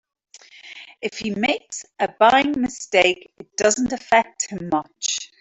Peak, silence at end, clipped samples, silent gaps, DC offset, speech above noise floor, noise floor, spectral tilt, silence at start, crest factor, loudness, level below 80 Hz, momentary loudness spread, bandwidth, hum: -2 dBFS; 0.15 s; under 0.1%; none; under 0.1%; 23 dB; -44 dBFS; -2.5 dB/octave; 0.35 s; 18 dB; -20 LUFS; -58 dBFS; 15 LU; 8.4 kHz; none